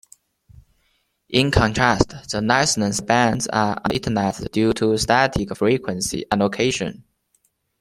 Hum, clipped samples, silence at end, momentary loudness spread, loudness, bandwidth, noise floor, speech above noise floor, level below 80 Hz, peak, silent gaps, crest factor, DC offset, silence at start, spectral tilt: none; under 0.1%; 0.9 s; 6 LU; -20 LUFS; 15 kHz; -67 dBFS; 47 dB; -40 dBFS; 0 dBFS; none; 20 dB; under 0.1%; 1.3 s; -4.5 dB/octave